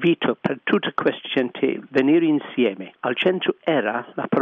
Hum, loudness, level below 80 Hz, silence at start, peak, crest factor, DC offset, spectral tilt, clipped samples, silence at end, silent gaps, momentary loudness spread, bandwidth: none; -22 LUFS; -68 dBFS; 0 s; -6 dBFS; 16 dB; under 0.1%; -8 dB/octave; under 0.1%; 0 s; none; 6 LU; 5.4 kHz